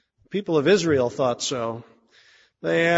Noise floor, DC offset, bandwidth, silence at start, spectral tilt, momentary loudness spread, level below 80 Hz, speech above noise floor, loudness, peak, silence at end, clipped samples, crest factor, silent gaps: -56 dBFS; under 0.1%; 8 kHz; 0.3 s; -4.5 dB/octave; 13 LU; -64 dBFS; 35 dB; -23 LUFS; -6 dBFS; 0 s; under 0.1%; 16 dB; none